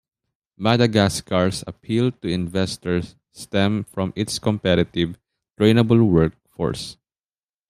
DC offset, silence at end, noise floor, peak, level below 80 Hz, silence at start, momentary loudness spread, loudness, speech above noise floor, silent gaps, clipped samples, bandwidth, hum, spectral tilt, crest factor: under 0.1%; 0.75 s; under -90 dBFS; -2 dBFS; -48 dBFS; 0.6 s; 11 LU; -21 LUFS; over 70 dB; none; under 0.1%; 14.5 kHz; none; -6 dB/octave; 20 dB